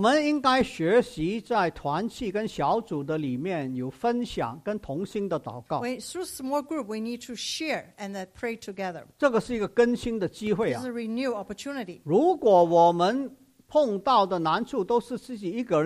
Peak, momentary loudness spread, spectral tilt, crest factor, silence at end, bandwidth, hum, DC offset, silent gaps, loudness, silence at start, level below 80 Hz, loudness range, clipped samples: -8 dBFS; 12 LU; -5.5 dB/octave; 18 dB; 0 s; 14.5 kHz; none; under 0.1%; none; -27 LUFS; 0 s; -56 dBFS; 8 LU; under 0.1%